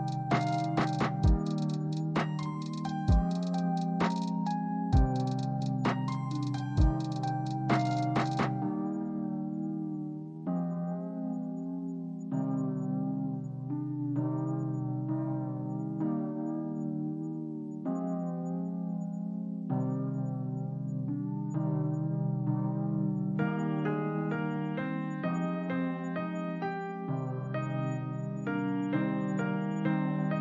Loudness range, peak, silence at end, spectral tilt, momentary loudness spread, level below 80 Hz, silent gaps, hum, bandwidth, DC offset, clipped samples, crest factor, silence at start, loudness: 4 LU; -14 dBFS; 0 s; -8 dB/octave; 7 LU; -42 dBFS; none; none; 8.8 kHz; under 0.1%; under 0.1%; 18 dB; 0 s; -33 LUFS